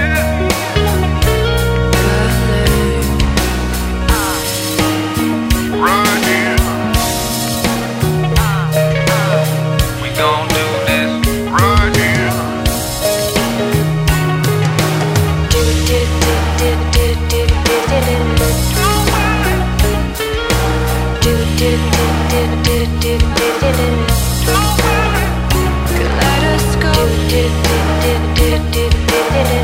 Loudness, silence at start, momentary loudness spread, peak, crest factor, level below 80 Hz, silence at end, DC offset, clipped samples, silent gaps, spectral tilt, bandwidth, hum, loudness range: -14 LUFS; 0 s; 3 LU; 0 dBFS; 12 dB; -20 dBFS; 0 s; under 0.1%; under 0.1%; none; -4.5 dB/octave; 16.5 kHz; none; 1 LU